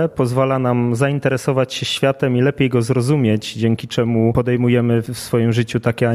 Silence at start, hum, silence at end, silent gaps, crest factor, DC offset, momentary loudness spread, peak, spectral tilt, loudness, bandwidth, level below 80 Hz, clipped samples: 0 s; none; 0 s; none; 14 dB; under 0.1%; 4 LU; -2 dBFS; -6.5 dB/octave; -17 LUFS; 14.5 kHz; -48 dBFS; under 0.1%